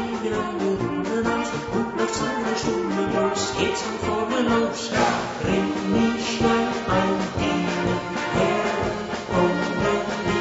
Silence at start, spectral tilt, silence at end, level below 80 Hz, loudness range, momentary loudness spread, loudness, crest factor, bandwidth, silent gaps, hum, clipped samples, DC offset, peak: 0 s; -5 dB/octave; 0 s; -46 dBFS; 2 LU; 4 LU; -23 LUFS; 18 dB; 8 kHz; none; none; under 0.1%; under 0.1%; -4 dBFS